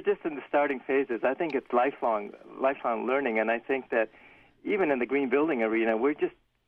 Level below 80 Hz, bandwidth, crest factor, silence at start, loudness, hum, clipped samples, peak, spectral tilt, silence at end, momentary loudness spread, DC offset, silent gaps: -70 dBFS; 5 kHz; 16 dB; 0 s; -28 LUFS; none; under 0.1%; -12 dBFS; -7.5 dB/octave; 0.35 s; 6 LU; under 0.1%; none